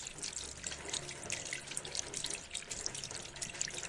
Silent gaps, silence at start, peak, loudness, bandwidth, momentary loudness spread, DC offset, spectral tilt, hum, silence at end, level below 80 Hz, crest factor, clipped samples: none; 0 s; -16 dBFS; -40 LUFS; 11.5 kHz; 3 LU; under 0.1%; -0.5 dB/octave; none; 0 s; -62 dBFS; 26 dB; under 0.1%